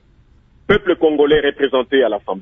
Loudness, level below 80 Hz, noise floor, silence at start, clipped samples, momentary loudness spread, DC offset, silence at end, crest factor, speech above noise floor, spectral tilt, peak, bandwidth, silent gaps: -15 LUFS; -42 dBFS; -51 dBFS; 0.7 s; under 0.1%; 4 LU; under 0.1%; 0 s; 16 dB; 36 dB; -7.5 dB/octave; -2 dBFS; 3.7 kHz; none